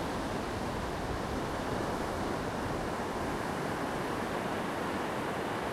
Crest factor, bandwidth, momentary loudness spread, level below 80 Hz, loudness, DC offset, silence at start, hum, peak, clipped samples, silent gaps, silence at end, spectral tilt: 12 dB; 16 kHz; 1 LU; -48 dBFS; -35 LUFS; under 0.1%; 0 s; none; -22 dBFS; under 0.1%; none; 0 s; -5 dB/octave